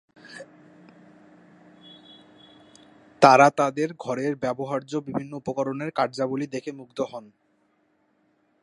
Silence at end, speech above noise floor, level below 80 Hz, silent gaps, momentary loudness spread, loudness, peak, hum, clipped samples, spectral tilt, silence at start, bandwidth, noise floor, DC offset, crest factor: 1.4 s; 44 dB; -70 dBFS; none; 22 LU; -24 LUFS; 0 dBFS; none; under 0.1%; -5.5 dB/octave; 0.25 s; 11.5 kHz; -67 dBFS; under 0.1%; 26 dB